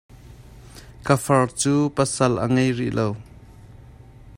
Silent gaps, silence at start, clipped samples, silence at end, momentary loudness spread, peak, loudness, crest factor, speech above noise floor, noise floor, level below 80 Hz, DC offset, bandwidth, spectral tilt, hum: none; 0.15 s; under 0.1%; 0 s; 8 LU; -4 dBFS; -21 LUFS; 20 dB; 25 dB; -45 dBFS; -48 dBFS; under 0.1%; 16 kHz; -5.5 dB/octave; none